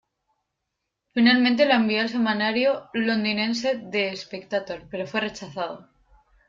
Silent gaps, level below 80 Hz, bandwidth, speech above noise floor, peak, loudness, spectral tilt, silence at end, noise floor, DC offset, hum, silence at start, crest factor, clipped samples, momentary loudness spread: none; -64 dBFS; 7.6 kHz; 58 dB; -6 dBFS; -23 LUFS; -5 dB/octave; 0.65 s; -81 dBFS; under 0.1%; none; 1.15 s; 20 dB; under 0.1%; 14 LU